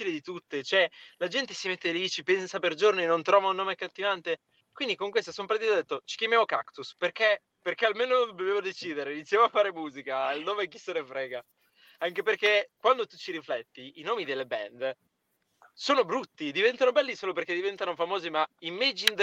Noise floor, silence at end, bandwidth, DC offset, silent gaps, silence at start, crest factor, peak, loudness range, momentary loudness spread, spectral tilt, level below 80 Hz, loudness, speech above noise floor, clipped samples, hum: -77 dBFS; 0 s; 16.5 kHz; under 0.1%; none; 0 s; 28 dB; -2 dBFS; 3 LU; 11 LU; -3 dB/octave; -82 dBFS; -29 LUFS; 48 dB; under 0.1%; none